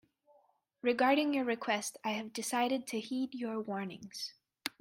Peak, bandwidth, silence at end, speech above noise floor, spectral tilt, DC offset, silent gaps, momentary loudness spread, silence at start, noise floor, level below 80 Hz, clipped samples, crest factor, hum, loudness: -14 dBFS; 16.5 kHz; 0.1 s; 37 dB; -3.5 dB/octave; under 0.1%; none; 14 LU; 0.85 s; -71 dBFS; -82 dBFS; under 0.1%; 22 dB; none; -35 LUFS